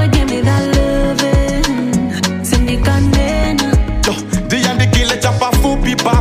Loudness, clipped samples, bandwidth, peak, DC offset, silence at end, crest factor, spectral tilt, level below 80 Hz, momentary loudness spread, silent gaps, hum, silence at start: -14 LUFS; under 0.1%; 16 kHz; -2 dBFS; under 0.1%; 0 s; 12 dB; -5 dB/octave; -18 dBFS; 4 LU; none; none; 0 s